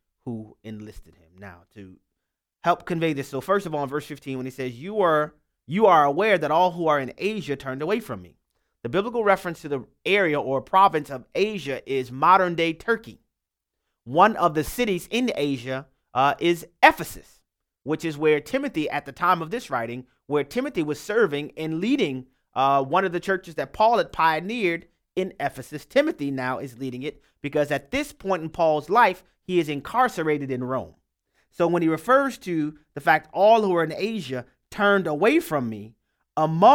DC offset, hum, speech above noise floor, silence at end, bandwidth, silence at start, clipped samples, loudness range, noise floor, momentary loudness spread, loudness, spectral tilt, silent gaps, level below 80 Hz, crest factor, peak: under 0.1%; none; 60 dB; 0 s; 18 kHz; 0.25 s; under 0.1%; 5 LU; -83 dBFS; 14 LU; -23 LUFS; -5.5 dB/octave; none; -56 dBFS; 22 dB; -2 dBFS